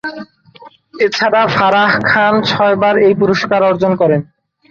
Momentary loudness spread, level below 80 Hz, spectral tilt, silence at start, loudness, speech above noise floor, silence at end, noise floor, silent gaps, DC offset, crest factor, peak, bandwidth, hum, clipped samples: 6 LU; -52 dBFS; -6 dB/octave; 0.05 s; -12 LUFS; 29 dB; 0.45 s; -41 dBFS; none; under 0.1%; 12 dB; 0 dBFS; 7.4 kHz; none; under 0.1%